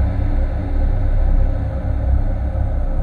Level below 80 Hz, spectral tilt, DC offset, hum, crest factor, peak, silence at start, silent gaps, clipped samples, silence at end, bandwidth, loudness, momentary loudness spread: -16 dBFS; -10 dB/octave; under 0.1%; none; 12 dB; -4 dBFS; 0 s; none; under 0.1%; 0 s; 3.9 kHz; -21 LUFS; 3 LU